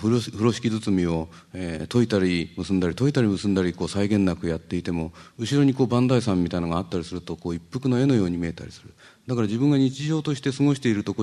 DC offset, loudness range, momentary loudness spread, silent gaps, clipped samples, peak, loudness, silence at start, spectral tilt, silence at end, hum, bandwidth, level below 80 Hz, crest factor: under 0.1%; 2 LU; 11 LU; none; under 0.1%; -6 dBFS; -24 LUFS; 0 s; -7 dB/octave; 0 s; none; 12 kHz; -50 dBFS; 18 dB